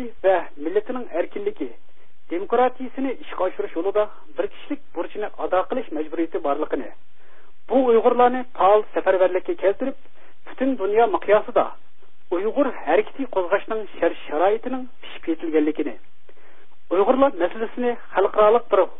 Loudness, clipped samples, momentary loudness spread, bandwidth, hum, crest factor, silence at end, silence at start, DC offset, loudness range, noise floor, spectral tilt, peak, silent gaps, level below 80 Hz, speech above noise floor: -22 LUFS; under 0.1%; 12 LU; 3.9 kHz; none; 18 dB; 0.1 s; 0 s; 4%; 6 LU; -55 dBFS; -9.5 dB/octave; -4 dBFS; none; -60 dBFS; 33 dB